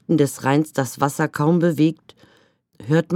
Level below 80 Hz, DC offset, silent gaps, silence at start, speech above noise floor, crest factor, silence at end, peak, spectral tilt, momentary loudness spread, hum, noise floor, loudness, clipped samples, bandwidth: -66 dBFS; under 0.1%; none; 0.1 s; 39 dB; 18 dB; 0 s; -2 dBFS; -6.5 dB/octave; 6 LU; none; -59 dBFS; -20 LUFS; under 0.1%; 16.5 kHz